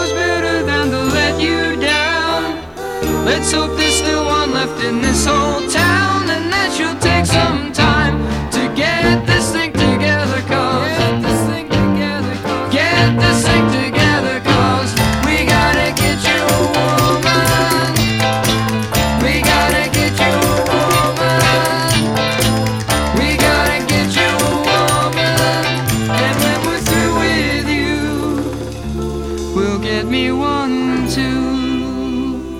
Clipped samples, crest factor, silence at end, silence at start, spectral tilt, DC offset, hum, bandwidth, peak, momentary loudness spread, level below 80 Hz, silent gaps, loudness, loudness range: under 0.1%; 14 dB; 0 s; 0 s; -4.5 dB/octave; 0.2%; none; 17.5 kHz; 0 dBFS; 6 LU; -30 dBFS; none; -14 LUFS; 4 LU